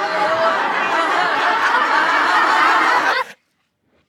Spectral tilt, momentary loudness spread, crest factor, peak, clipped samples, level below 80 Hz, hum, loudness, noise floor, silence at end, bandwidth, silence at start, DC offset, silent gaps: -2 dB/octave; 5 LU; 14 dB; -2 dBFS; under 0.1%; -72 dBFS; none; -15 LUFS; -66 dBFS; 0.75 s; 18.5 kHz; 0 s; under 0.1%; none